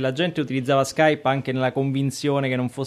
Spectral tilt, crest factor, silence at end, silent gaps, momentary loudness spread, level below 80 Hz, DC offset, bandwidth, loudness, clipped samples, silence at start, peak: -6 dB/octave; 18 dB; 0 s; none; 5 LU; -64 dBFS; under 0.1%; 14.5 kHz; -22 LUFS; under 0.1%; 0 s; -4 dBFS